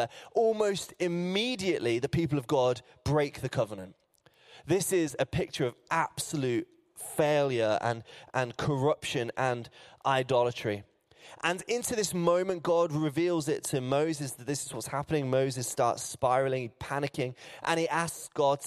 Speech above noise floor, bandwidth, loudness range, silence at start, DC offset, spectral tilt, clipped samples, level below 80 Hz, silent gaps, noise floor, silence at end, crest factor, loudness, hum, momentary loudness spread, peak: 33 dB; 15 kHz; 2 LU; 0 s; under 0.1%; -5 dB/octave; under 0.1%; -60 dBFS; none; -63 dBFS; 0 s; 20 dB; -30 LUFS; none; 8 LU; -10 dBFS